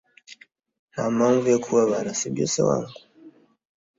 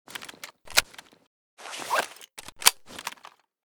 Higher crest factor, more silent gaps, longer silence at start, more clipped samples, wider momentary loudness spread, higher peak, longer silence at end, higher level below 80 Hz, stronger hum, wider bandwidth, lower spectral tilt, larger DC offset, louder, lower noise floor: second, 18 dB vs 30 dB; second, 0.79-0.88 s vs 1.27-1.57 s; first, 0.3 s vs 0.1 s; neither; second, 9 LU vs 23 LU; second, -8 dBFS vs -2 dBFS; first, 0.7 s vs 0.55 s; about the same, -62 dBFS vs -62 dBFS; neither; second, 7.8 kHz vs over 20 kHz; first, -5 dB/octave vs 1.5 dB/octave; neither; first, -22 LUFS vs -26 LUFS; about the same, -51 dBFS vs -53 dBFS